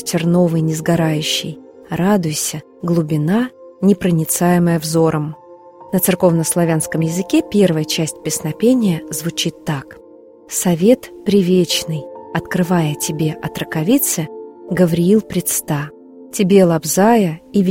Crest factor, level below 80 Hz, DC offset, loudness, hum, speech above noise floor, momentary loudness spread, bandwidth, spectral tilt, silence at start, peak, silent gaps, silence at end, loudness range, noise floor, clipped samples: 16 dB; -50 dBFS; under 0.1%; -16 LUFS; none; 24 dB; 11 LU; 16.5 kHz; -5 dB/octave; 0 s; 0 dBFS; none; 0 s; 2 LU; -40 dBFS; under 0.1%